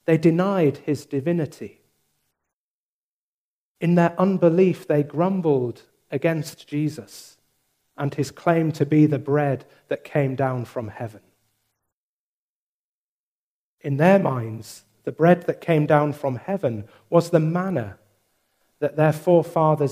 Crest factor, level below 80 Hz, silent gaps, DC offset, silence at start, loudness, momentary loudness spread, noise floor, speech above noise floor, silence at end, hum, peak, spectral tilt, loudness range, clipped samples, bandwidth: 20 dB; -68 dBFS; 2.53-3.75 s, 11.92-13.78 s; under 0.1%; 0.1 s; -22 LUFS; 15 LU; under -90 dBFS; over 69 dB; 0 s; none; -2 dBFS; -8 dB/octave; 8 LU; under 0.1%; 15.5 kHz